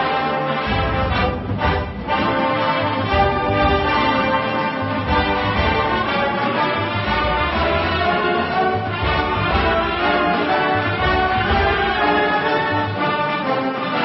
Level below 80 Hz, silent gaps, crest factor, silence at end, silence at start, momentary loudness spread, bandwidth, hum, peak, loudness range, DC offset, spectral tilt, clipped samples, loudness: -32 dBFS; none; 14 dB; 0 s; 0 s; 4 LU; 5.8 kHz; none; -4 dBFS; 1 LU; under 0.1%; -10.5 dB/octave; under 0.1%; -18 LUFS